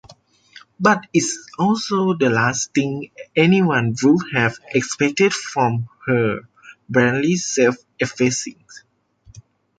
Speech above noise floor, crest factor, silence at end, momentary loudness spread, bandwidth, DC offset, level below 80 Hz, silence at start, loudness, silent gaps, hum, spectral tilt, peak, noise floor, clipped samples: 34 dB; 18 dB; 0.4 s; 8 LU; 9.4 kHz; under 0.1%; -58 dBFS; 0.1 s; -19 LUFS; none; none; -5 dB/octave; -2 dBFS; -52 dBFS; under 0.1%